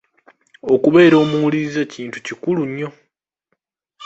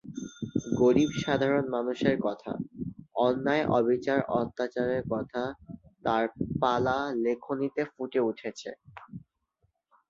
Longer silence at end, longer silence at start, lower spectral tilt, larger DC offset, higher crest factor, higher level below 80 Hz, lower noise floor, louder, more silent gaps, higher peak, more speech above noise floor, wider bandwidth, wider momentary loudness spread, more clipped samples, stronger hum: second, 0 s vs 0.9 s; first, 0.65 s vs 0.05 s; about the same, -6.5 dB/octave vs -6.5 dB/octave; neither; about the same, 18 dB vs 20 dB; about the same, -60 dBFS vs -58 dBFS; about the same, -72 dBFS vs -75 dBFS; first, -16 LUFS vs -29 LUFS; neither; first, 0 dBFS vs -10 dBFS; first, 57 dB vs 47 dB; about the same, 8 kHz vs 7.6 kHz; about the same, 17 LU vs 16 LU; neither; neither